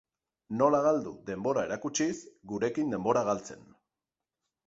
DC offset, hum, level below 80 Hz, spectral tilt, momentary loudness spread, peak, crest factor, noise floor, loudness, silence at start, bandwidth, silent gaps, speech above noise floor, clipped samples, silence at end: under 0.1%; none; -68 dBFS; -5 dB/octave; 13 LU; -10 dBFS; 20 dB; under -90 dBFS; -30 LUFS; 0.5 s; 8 kHz; none; over 60 dB; under 0.1%; 1.1 s